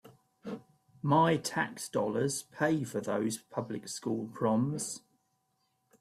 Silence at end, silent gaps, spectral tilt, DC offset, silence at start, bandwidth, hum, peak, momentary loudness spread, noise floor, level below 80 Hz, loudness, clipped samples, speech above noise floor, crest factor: 1.05 s; none; -5 dB/octave; under 0.1%; 0.05 s; 15.5 kHz; none; -14 dBFS; 17 LU; -77 dBFS; -72 dBFS; -32 LUFS; under 0.1%; 46 dB; 18 dB